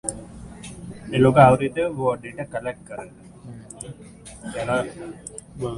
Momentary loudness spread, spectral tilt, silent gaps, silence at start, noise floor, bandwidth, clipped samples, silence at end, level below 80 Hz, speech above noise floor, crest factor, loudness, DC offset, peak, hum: 26 LU; -6 dB/octave; none; 0.05 s; -43 dBFS; 11.5 kHz; under 0.1%; 0 s; -48 dBFS; 22 dB; 24 dB; -21 LUFS; under 0.1%; 0 dBFS; none